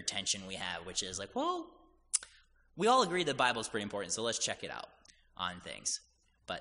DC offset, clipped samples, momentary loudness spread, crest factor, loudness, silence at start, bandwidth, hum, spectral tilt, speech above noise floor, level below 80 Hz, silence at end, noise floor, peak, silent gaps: under 0.1%; under 0.1%; 15 LU; 24 dB; -35 LUFS; 0 s; 10.5 kHz; none; -2 dB/octave; 30 dB; -66 dBFS; 0 s; -65 dBFS; -12 dBFS; none